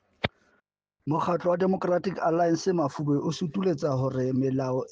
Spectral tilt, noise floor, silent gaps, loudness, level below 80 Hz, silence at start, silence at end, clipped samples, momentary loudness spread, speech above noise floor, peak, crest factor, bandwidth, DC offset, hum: -7 dB/octave; -74 dBFS; none; -27 LUFS; -62 dBFS; 0.25 s; 0.05 s; under 0.1%; 6 LU; 48 dB; -12 dBFS; 16 dB; 8 kHz; under 0.1%; none